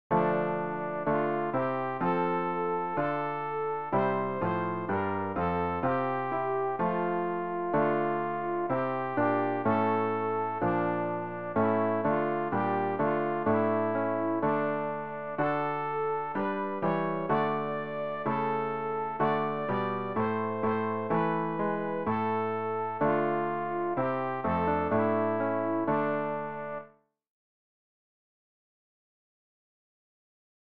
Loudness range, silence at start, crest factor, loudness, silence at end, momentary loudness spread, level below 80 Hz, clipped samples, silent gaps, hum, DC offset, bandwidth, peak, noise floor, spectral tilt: 2 LU; 0.1 s; 16 dB; -30 LUFS; 3.4 s; 5 LU; -62 dBFS; under 0.1%; none; none; 0.3%; 5.2 kHz; -14 dBFS; -56 dBFS; -6.5 dB/octave